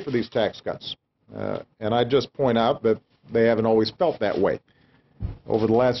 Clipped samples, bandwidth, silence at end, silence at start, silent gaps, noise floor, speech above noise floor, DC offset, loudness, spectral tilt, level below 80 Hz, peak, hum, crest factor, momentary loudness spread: under 0.1%; 6.2 kHz; 0 s; 0 s; none; -42 dBFS; 19 dB; under 0.1%; -24 LUFS; -7.5 dB/octave; -48 dBFS; -8 dBFS; none; 16 dB; 15 LU